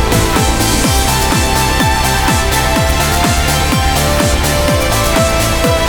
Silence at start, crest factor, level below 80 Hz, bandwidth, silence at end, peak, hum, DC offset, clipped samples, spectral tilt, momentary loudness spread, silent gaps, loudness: 0 s; 12 dB; -18 dBFS; over 20 kHz; 0 s; 0 dBFS; none; 0.5%; under 0.1%; -4 dB/octave; 1 LU; none; -12 LUFS